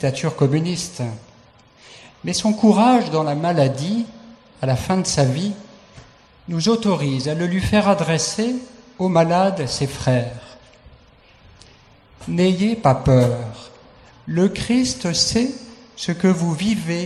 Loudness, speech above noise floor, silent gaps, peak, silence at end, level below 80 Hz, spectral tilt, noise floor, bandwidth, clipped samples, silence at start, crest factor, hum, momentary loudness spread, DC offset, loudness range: -19 LUFS; 32 dB; none; -2 dBFS; 0 s; -46 dBFS; -5.5 dB/octave; -50 dBFS; 12.5 kHz; under 0.1%; 0 s; 18 dB; none; 14 LU; under 0.1%; 4 LU